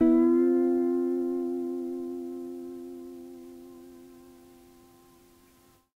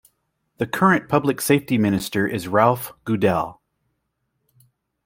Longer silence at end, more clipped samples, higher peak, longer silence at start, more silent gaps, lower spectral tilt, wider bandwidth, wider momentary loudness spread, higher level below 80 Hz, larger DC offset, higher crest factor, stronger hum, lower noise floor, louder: first, 1.7 s vs 1.55 s; neither; second, -14 dBFS vs -2 dBFS; second, 0 s vs 0.6 s; neither; first, -7.5 dB/octave vs -5.5 dB/octave; second, 4.4 kHz vs 17 kHz; first, 25 LU vs 9 LU; second, -66 dBFS vs -58 dBFS; neither; about the same, 16 dB vs 20 dB; neither; second, -61 dBFS vs -74 dBFS; second, -28 LUFS vs -20 LUFS